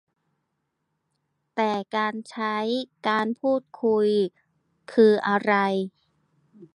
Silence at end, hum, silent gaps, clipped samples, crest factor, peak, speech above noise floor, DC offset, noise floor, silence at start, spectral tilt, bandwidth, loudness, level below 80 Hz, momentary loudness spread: 0.1 s; none; none; under 0.1%; 20 dB; -6 dBFS; 54 dB; under 0.1%; -78 dBFS; 1.55 s; -6.5 dB/octave; 10.5 kHz; -24 LUFS; -78 dBFS; 10 LU